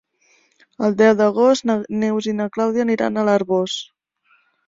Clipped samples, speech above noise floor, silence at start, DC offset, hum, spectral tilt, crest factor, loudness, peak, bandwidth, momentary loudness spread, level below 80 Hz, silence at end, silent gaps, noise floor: under 0.1%; 43 dB; 0.8 s; under 0.1%; none; -5.5 dB/octave; 18 dB; -18 LUFS; -2 dBFS; 7.8 kHz; 8 LU; -62 dBFS; 0.85 s; none; -61 dBFS